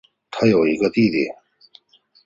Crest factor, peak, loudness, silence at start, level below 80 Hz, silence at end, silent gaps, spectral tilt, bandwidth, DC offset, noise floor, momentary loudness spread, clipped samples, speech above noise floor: 18 dB; -4 dBFS; -19 LUFS; 0.3 s; -56 dBFS; 0.95 s; none; -7 dB/octave; 7.6 kHz; under 0.1%; -53 dBFS; 10 LU; under 0.1%; 36 dB